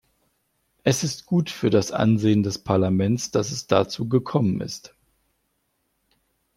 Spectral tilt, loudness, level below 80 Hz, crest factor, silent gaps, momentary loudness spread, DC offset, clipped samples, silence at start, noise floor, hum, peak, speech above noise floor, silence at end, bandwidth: -6 dB/octave; -23 LUFS; -58 dBFS; 22 dB; none; 5 LU; under 0.1%; under 0.1%; 0.85 s; -72 dBFS; none; -2 dBFS; 51 dB; 1.7 s; 15.5 kHz